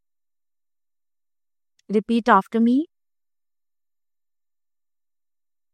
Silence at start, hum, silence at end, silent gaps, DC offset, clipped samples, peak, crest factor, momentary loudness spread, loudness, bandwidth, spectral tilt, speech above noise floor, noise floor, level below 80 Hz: 1.9 s; none; 2.9 s; none; under 0.1%; under 0.1%; -4 dBFS; 22 dB; 8 LU; -20 LUFS; 9.6 kHz; -7 dB/octave; over 71 dB; under -90 dBFS; -70 dBFS